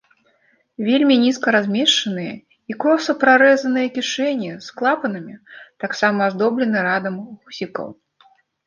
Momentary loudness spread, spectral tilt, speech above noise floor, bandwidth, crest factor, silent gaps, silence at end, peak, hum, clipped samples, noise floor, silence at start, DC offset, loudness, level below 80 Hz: 17 LU; -4 dB/octave; 42 dB; 9.8 kHz; 18 dB; none; 0.75 s; -2 dBFS; none; under 0.1%; -61 dBFS; 0.8 s; under 0.1%; -18 LUFS; -70 dBFS